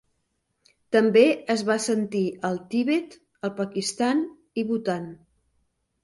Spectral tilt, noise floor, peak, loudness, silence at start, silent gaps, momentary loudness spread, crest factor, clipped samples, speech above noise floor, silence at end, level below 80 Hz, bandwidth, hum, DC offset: -5 dB/octave; -75 dBFS; -6 dBFS; -24 LUFS; 0.9 s; none; 13 LU; 20 dB; under 0.1%; 51 dB; 0.9 s; -70 dBFS; 11.5 kHz; none; under 0.1%